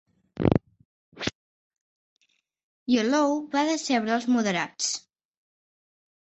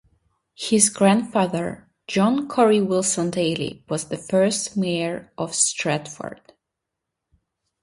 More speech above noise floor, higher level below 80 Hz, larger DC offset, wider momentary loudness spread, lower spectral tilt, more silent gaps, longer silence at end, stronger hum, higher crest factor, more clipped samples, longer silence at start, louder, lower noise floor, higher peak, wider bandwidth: second, 47 dB vs 61 dB; first, -52 dBFS vs -62 dBFS; neither; about the same, 10 LU vs 12 LU; about the same, -4.5 dB/octave vs -4 dB/octave; first, 0.85-1.12 s, 1.35-1.70 s, 1.81-2.16 s, 2.64-2.86 s vs none; about the same, 1.4 s vs 1.5 s; neither; about the same, 24 dB vs 20 dB; neither; second, 0.35 s vs 0.6 s; second, -26 LUFS vs -21 LUFS; second, -71 dBFS vs -83 dBFS; about the same, -4 dBFS vs -2 dBFS; second, 8.4 kHz vs 11.5 kHz